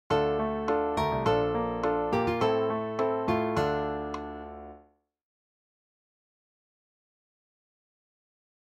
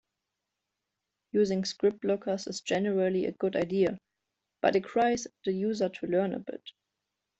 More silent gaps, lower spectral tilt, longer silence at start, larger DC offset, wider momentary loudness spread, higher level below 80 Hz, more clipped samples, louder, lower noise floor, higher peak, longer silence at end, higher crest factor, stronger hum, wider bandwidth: neither; first, -7 dB/octave vs -5.5 dB/octave; second, 0.1 s vs 1.35 s; neither; first, 12 LU vs 6 LU; first, -52 dBFS vs -70 dBFS; neither; about the same, -28 LUFS vs -30 LUFS; second, -61 dBFS vs -86 dBFS; about the same, -12 dBFS vs -12 dBFS; first, 3.9 s vs 0.7 s; about the same, 18 dB vs 20 dB; neither; first, 13 kHz vs 8.2 kHz